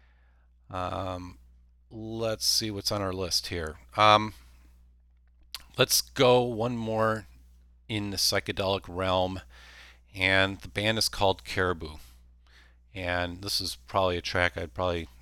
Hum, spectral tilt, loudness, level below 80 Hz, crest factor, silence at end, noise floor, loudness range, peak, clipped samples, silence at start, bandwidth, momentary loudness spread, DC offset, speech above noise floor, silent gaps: 60 Hz at -55 dBFS; -3.5 dB/octave; -27 LUFS; -50 dBFS; 24 dB; 0.15 s; -60 dBFS; 5 LU; -6 dBFS; under 0.1%; 0.7 s; 19 kHz; 17 LU; under 0.1%; 32 dB; none